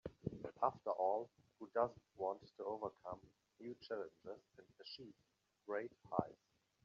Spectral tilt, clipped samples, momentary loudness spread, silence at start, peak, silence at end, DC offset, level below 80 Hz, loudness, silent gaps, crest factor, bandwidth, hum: -5 dB/octave; under 0.1%; 16 LU; 0.05 s; -20 dBFS; 0.5 s; under 0.1%; -76 dBFS; -45 LUFS; none; 26 dB; 7.2 kHz; none